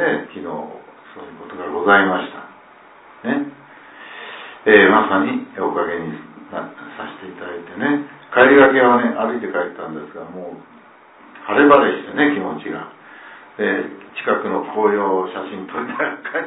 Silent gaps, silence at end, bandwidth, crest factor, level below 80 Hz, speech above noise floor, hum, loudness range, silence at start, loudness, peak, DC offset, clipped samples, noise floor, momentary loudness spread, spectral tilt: none; 0 s; 4 kHz; 18 dB; -60 dBFS; 29 dB; none; 5 LU; 0 s; -17 LUFS; 0 dBFS; under 0.1%; under 0.1%; -46 dBFS; 23 LU; -9 dB/octave